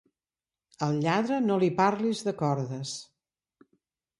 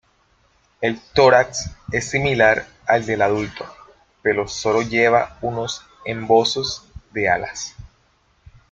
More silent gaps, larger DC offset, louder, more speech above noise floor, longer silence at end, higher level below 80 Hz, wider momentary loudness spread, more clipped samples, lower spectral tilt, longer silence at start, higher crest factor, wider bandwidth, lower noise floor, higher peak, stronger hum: neither; neither; second, -28 LUFS vs -19 LUFS; first, over 63 dB vs 41 dB; first, 1.15 s vs 0.9 s; second, -70 dBFS vs -48 dBFS; second, 10 LU vs 14 LU; neither; first, -6 dB/octave vs -4 dB/octave; about the same, 0.8 s vs 0.8 s; about the same, 20 dB vs 20 dB; first, 11.5 kHz vs 9.2 kHz; first, under -90 dBFS vs -60 dBFS; second, -10 dBFS vs -2 dBFS; neither